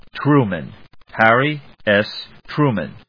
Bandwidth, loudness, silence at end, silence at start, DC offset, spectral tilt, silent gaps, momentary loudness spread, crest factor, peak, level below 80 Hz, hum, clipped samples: 5.4 kHz; -17 LUFS; 0.1 s; 0.15 s; 0.3%; -8.5 dB/octave; none; 16 LU; 18 dB; 0 dBFS; -54 dBFS; none; under 0.1%